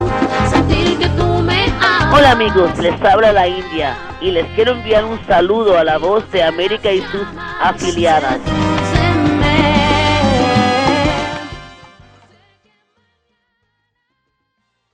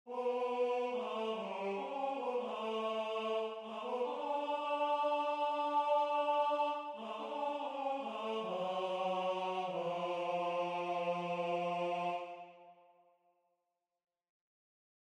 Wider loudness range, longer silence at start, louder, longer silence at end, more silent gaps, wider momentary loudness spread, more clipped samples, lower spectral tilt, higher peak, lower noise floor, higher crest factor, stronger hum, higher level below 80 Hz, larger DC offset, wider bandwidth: about the same, 5 LU vs 5 LU; about the same, 0 s vs 0.05 s; first, -13 LUFS vs -37 LUFS; first, 3.2 s vs 2.4 s; neither; about the same, 9 LU vs 7 LU; neither; about the same, -5.5 dB/octave vs -5.5 dB/octave; first, 0 dBFS vs -24 dBFS; second, -68 dBFS vs -87 dBFS; about the same, 14 dB vs 14 dB; neither; first, -30 dBFS vs under -90 dBFS; neither; about the same, 11 kHz vs 10.5 kHz